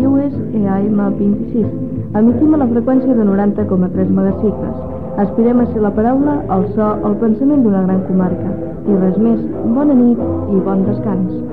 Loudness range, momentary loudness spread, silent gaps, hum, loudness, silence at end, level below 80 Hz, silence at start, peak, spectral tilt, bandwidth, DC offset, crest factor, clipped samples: 1 LU; 6 LU; none; none; -14 LUFS; 0 s; -38 dBFS; 0 s; -2 dBFS; -12.5 dB/octave; 3.3 kHz; 2%; 12 dB; under 0.1%